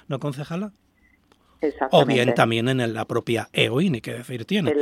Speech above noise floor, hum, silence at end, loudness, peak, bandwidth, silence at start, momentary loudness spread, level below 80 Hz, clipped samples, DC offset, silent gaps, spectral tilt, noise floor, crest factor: 38 dB; none; 0 s; -22 LUFS; 0 dBFS; 15 kHz; 0.1 s; 12 LU; -62 dBFS; under 0.1%; under 0.1%; none; -6 dB/octave; -60 dBFS; 22 dB